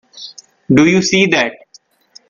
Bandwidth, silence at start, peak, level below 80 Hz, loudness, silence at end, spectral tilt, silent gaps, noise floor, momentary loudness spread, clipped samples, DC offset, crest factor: 7.4 kHz; 0.15 s; 0 dBFS; -52 dBFS; -12 LUFS; 0.75 s; -4.5 dB/octave; none; -49 dBFS; 21 LU; under 0.1%; under 0.1%; 16 dB